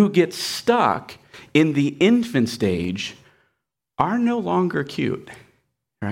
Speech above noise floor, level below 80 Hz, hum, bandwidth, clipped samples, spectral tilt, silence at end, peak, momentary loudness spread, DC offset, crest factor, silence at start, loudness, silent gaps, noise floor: 57 dB; -58 dBFS; none; 16.5 kHz; under 0.1%; -5.5 dB/octave; 0 s; -4 dBFS; 14 LU; under 0.1%; 18 dB; 0 s; -21 LUFS; none; -77 dBFS